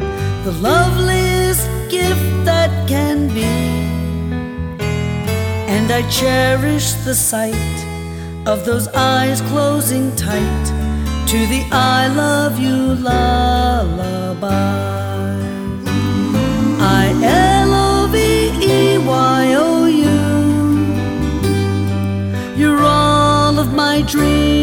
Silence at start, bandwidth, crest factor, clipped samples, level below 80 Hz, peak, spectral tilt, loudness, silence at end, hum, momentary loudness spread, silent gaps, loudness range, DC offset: 0 s; over 20 kHz; 14 dB; under 0.1%; -26 dBFS; -2 dBFS; -5 dB/octave; -15 LUFS; 0 s; none; 8 LU; none; 4 LU; under 0.1%